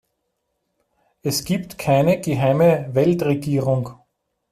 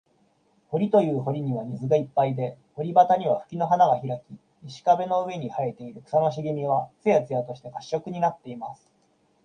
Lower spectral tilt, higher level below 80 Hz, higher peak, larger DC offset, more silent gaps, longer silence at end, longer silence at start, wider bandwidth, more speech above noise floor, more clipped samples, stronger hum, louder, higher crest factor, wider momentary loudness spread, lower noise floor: second, -6.5 dB/octave vs -8 dB/octave; first, -54 dBFS vs -68 dBFS; about the same, -6 dBFS vs -4 dBFS; neither; neither; about the same, 0.6 s vs 0.7 s; first, 1.25 s vs 0.7 s; first, 16 kHz vs 9.2 kHz; first, 56 dB vs 41 dB; neither; neither; first, -20 LUFS vs -25 LUFS; about the same, 16 dB vs 20 dB; second, 8 LU vs 15 LU; first, -74 dBFS vs -66 dBFS